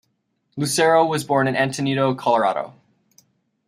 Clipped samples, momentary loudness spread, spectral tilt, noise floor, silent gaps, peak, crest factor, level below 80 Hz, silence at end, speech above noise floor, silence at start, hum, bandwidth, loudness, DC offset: under 0.1%; 12 LU; -4.5 dB/octave; -70 dBFS; none; -4 dBFS; 18 dB; -66 dBFS; 0.95 s; 51 dB; 0.55 s; none; 15.5 kHz; -20 LUFS; under 0.1%